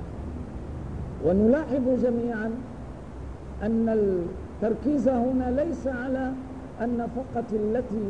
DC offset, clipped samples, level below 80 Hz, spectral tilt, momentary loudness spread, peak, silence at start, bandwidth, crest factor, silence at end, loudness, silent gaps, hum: 0.3%; under 0.1%; -42 dBFS; -9 dB/octave; 15 LU; -10 dBFS; 0 s; 9.6 kHz; 16 dB; 0 s; -27 LUFS; none; none